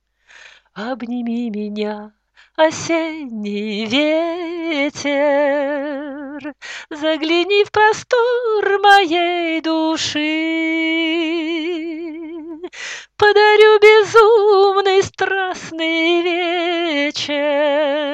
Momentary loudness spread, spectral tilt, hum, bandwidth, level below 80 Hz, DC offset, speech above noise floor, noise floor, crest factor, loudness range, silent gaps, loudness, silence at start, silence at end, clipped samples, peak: 18 LU; -3.5 dB/octave; none; 9 kHz; -60 dBFS; under 0.1%; 29 dB; -45 dBFS; 16 dB; 8 LU; none; -16 LUFS; 0.75 s; 0 s; under 0.1%; 0 dBFS